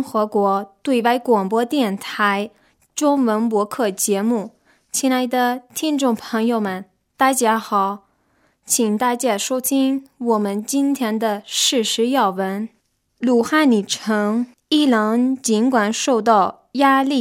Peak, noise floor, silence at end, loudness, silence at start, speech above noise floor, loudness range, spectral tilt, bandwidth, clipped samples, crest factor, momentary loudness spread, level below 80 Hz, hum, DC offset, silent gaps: -2 dBFS; -62 dBFS; 0 s; -19 LUFS; 0 s; 44 dB; 3 LU; -3.5 dB/octave; 16.5 kHz; under 0.1%; 16 dB; 8 LU; -70 dBFS; none; under 0.1%; none